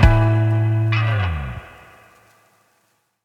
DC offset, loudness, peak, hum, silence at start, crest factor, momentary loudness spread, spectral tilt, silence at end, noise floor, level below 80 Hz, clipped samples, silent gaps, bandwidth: under 0.1%; -19 LUFS; 0 dBFS; none; 0 s; 18 dB; 14 LU; -8 dB/octave; 1.55 s; -65 dBFS; -26 dBFS; under 0.1%; none; 6 kHz